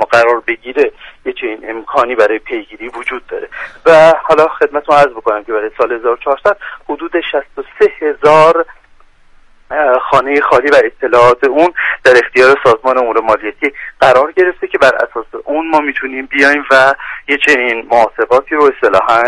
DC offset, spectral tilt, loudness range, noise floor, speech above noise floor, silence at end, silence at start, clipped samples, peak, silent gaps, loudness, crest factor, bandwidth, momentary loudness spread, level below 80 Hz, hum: under 0.1%; -4.5 dB/octave; 5 LU; -43 dBFS; 32 dB; 0 s; 0 s; 0.5%; 0 dBFS; none; -11 LUFS; 12 dB; 11.5 kHz; 13 LU; -46 dBFS; none